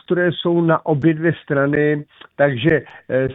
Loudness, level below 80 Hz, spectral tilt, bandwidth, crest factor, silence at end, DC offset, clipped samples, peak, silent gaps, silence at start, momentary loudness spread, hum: -18 LUFS; -50 dBFS; -10 dB/octave; 4 kHz; 16 dB; 0 s; under 0.1%; under 0.1%; -2 dBFS; none; 0.1 s; 5 LU; none